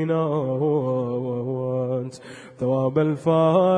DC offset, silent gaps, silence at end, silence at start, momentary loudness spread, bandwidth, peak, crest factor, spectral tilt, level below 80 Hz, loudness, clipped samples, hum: under 0.1%; none; 0 s; 0 s; 10 LU; 10 kHz; -6 dBFS; 16 dB; -8.5 dB/octave; -64 dBFS; -23 LUFS; under 0.1%; none